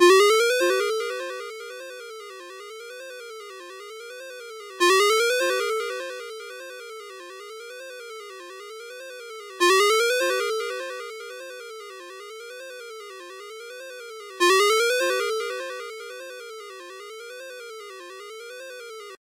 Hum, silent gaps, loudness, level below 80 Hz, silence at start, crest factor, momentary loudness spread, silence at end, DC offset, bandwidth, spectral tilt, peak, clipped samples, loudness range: none; none; -22 LUFS; under -90 dBFS; 0 s; 22 dB; 21 LU; 0.05 s; under 0.1%; 16 kHz; 1.5 dB/octave; -4 dBFS; under 0.1%; 14 LU